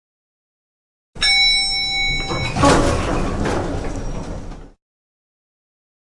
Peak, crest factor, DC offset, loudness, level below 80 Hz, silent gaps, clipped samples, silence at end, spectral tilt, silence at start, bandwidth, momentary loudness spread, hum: 0 dBFS; 20 dB; under 0.1%; -17 LUFS; -30 dBFS; none; under 0.1%; 1.4 s; -3.5 dB/octave; 1.15 s; 11.5 kHz; 17 LU; none